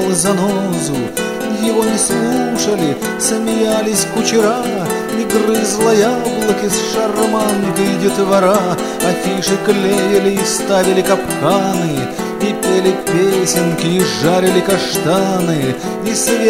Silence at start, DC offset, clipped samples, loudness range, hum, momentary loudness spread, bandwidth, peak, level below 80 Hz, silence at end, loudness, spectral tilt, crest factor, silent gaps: 0 s; under 0.1%; under 0.1%; 1 LU; none; 5 LU; 16.5 kHz; 0 dBFS; -46 dBFS; 0 s; -14 LUFS; -4 dB/octave; 14 dB; none